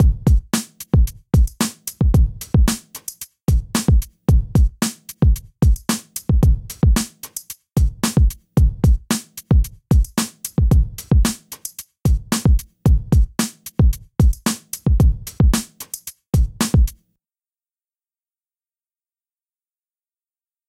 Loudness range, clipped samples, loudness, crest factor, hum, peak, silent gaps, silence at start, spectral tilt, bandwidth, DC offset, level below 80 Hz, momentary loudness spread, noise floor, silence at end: 4 LU; under 0.1%; -19 LUFS; 12 dB; none; -6 dBFS; none; 0 s; -5.5 dB/octave; 16.5 kHz; under 0.1%; -20 dBFS; 8 LU; under -90 dBFS; 3.75 s